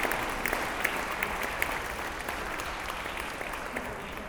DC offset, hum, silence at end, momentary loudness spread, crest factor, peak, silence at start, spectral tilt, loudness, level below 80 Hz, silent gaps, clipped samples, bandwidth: under 0.1%; none; 0 s; 5 LU; 24 dB; -8 dBFS; 0 s; -3 dB/octave; -32 LUFS; -46 dBFS; none; under 0.1%; over 20 kHz